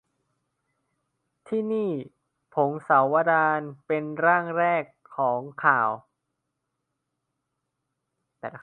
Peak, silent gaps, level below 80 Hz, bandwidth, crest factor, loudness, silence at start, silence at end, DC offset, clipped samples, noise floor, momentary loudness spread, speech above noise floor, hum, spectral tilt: -4 dBFS; none; -78 dBFS; 9.2 kHz; 22 dB; -24 LUFS; 1.5 s; 0.05 s; under 0.1%; under 0.1%; -81 dBFS; 13 LU; 57 dB; none; -8.5 dB/octave